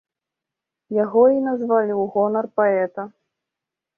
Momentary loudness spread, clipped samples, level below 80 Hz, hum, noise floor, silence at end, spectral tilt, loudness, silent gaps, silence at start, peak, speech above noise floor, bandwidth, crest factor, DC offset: 11 LU; under 0.1%; -70 dBFS; none; -86 dBFS; 0.9 s; -11 dB/octave; -20 LUFS; none; 0.9 s; -4 dBFS; 67 dB; 2.9 kHz; 16 dB; under 0.1%